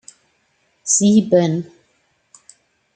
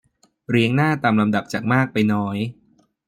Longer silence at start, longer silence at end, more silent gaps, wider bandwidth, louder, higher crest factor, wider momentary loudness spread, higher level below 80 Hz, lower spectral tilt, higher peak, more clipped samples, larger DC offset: first, 0.85 s vs 0.5 s; first, 1.3 s vs 0.55 s; neither; second, 9.6 kHz vs 15 kHz; first, -15 LUFS vs -20 LUFS; about the same, 18 dB vs 16 dB; first, 17 LU vs 7 LU; second, -66 dBFS vs -60 dBFS; second, -5 dB/octave vs -7 dB/octave; about the same, -2 dBFS vs -4 dBFS; neither; neither